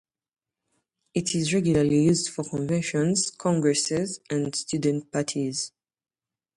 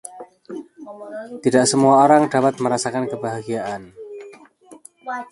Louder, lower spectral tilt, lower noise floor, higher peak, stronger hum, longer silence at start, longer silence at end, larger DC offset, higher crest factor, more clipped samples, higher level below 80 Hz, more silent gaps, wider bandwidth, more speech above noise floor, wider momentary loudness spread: second, -25 LUFS vs -18 LUFS; about the same, -5 dB/octave vs -4.5 dB/octave; first, -76 dBFS vs -46 dBFS; second, -10 dBFS vs 0 dBFS; neither; first, 1.15 s vs 0.05 s; first, 0.9 s vs 0.05 s; neither; about the same, 16 dB vs 20 dB; neither; first, -58 dBFS vs -64 dBFS; neither; about the same, 11.5 kHz vs 11.5 kHz; first, 52 dB vs 28 dB; second, 8 LU vs 24 LU